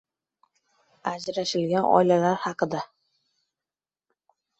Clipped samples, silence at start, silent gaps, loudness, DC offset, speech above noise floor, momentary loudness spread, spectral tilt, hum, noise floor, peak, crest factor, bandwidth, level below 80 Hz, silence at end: under 0.1%; 1.05 s; none; -24 LUFS; under 0.1%; over 67 dB; 14 LU; -5.5 dB/octave; none; under -90 dBFS; -4 dBFS; 24 dB; 8.2 kHz; -70 dBFS; 1.75 s